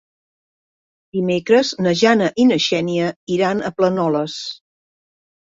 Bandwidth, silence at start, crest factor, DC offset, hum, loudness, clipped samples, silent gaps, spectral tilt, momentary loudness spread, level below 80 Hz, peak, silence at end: 7.8 kHz; 1.15 s; 18 dB; under 0.1%; none; -18 LUFS; under 0.1%; 3.16-3.27 s; -5 dB/octave; 12 LU; -60 dBFS; -2 dBFS; 0.9 s